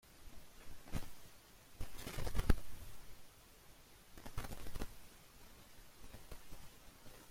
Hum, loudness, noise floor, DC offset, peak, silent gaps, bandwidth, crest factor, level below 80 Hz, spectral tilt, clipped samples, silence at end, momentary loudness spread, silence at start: none; -49 LUFS; -61 dBFS; under 0.1%; -16 dBFS; none; 16.5 kHz; 26 dB; -48 dBFS; -5 dB/octave; under 0.1%; 0 s; 19 LU; 0.05 s